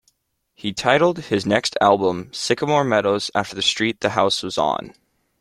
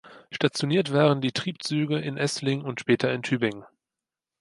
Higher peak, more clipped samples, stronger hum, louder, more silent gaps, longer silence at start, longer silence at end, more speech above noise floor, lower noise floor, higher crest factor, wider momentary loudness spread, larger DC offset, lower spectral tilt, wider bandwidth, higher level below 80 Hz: first, -2 dBFS vs -6 dBFS; neither; neither; first, -20 LUFS vs -25 LUFS; neither; first, 0.65 s vs 0.05 s; second, 0.5 s vs 0.75 s; second, 47 dB vs 64 dB; second, -67 dBFS vs -89 dBFS; about the same, 18 dB vs 20 dB; about the same, 7 LU vs 8 LU; neither; second, -4 dB/octave vs -5.5 dB/octave; first, 13.5 kHz vs 11.5 kHz; first, -58 dBFS vs -68 dBFS